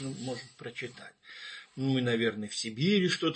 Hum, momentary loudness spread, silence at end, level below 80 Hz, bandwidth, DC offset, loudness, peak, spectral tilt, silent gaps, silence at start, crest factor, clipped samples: none; 17 LU; 0 s; -74 dBFS; 8.8 kHz; under 0.1%; -31 LUFS; -14 dBFS; -5 dB/octave; none; 0 s; 18 dB; under 0.1%